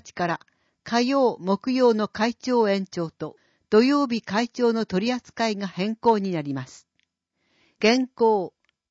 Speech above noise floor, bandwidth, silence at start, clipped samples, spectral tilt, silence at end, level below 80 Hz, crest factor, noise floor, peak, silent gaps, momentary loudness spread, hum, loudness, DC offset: 51 dB; 8 kHz; 0.05 s; under 0.1%; -5.5 dB/octave; 0.4 s; -66 dBFS; 18 dB; -74 dBFS; -6 dBFS; none; 11 LU; none; -23 LUFS; under 0.1%